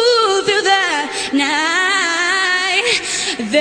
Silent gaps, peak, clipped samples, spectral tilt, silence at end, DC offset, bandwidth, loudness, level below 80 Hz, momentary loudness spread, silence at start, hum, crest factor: none; 0 dBFS; under 0.1%; -1 dB/octave; 0 s; under 0.1%; 13.5 kHz; -14 LUFS; -56 dBFS; 5 LU; 0 s; none; 14 dB